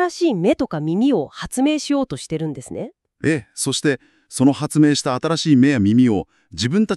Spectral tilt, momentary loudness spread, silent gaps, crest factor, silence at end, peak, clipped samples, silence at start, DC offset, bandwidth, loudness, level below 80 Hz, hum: -5.5 dB/octave; 13 LU; none; 16 dB; 0 s; -4 dBFS; under 0.1%; 0 s; under 0.1%; 13 kHz; -19 LUFS; -52 dBFS; none